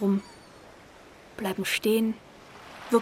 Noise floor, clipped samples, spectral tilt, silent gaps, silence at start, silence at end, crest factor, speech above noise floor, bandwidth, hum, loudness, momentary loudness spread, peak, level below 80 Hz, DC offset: -51 dBFS; under 0.1%; -5 dB/octave; none; 0 s; 0 s; 20 dB; 24 dB; 16 kHz; none; -28 LUFS; 25 LU; -10 dBFS; -64 dBFS; under 0.1%